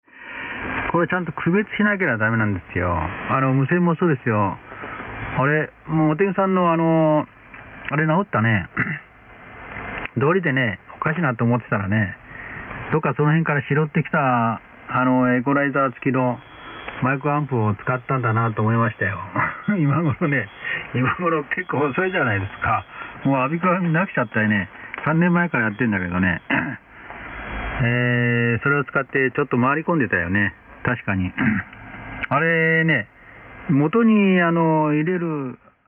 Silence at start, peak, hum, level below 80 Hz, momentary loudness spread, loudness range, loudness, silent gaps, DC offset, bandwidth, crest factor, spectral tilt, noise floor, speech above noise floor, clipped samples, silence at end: 0.15 s; -6 dBFS; none; -48 dBFS; 13 LU; 3 LU; -21 LUFS; none; under 0.1%; 3.7 kHz; 16 dB; -11 dB/octave; -43 dBFS; 24 dB; under 0.1%; 0.3 s